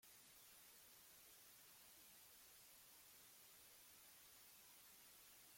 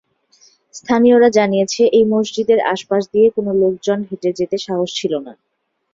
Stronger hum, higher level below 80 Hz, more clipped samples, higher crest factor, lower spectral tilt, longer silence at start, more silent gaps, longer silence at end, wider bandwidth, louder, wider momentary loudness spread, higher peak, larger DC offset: neither; second, under -90 dBFS vs -58 dBFS; neither; about the same, 14 dB vs 14 dB; second, 0 dB/octave vs -5 dB/octave; second, 0 s vs 0.75 s; neither; second, 0 s vs 0.6 s; first, 16.5 kHz vs 7.8 kHz; second, -64 LUFS vs -16 LUFS; second, 0 LU vs 10 LU; second, -54 dBFS vs -2 dBFS; neither